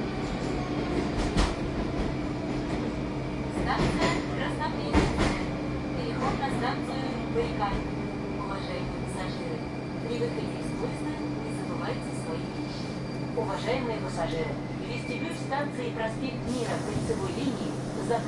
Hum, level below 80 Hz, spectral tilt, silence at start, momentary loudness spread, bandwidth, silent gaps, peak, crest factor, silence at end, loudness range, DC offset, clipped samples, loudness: none; -40 dBFS; -6 dB/octave; 0 s; 6 LU; 11.5 kHz; none; -10 dBFS; 20 dB; 0 s; 4 LU; under 0.1%; under 0.1%; -31 LUFS